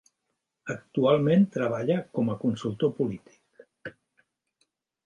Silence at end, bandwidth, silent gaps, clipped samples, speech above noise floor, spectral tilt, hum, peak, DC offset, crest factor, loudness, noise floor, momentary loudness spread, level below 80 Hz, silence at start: 1.15 s; 9 kHz; none; under 0.1%; 56 dB; -8 dB/octave; none; -8 dBFS; under 0.1%; 20 dB; -26 LUFS; -81 dBFS; 22 LU; -66 dBFS; 0.65 s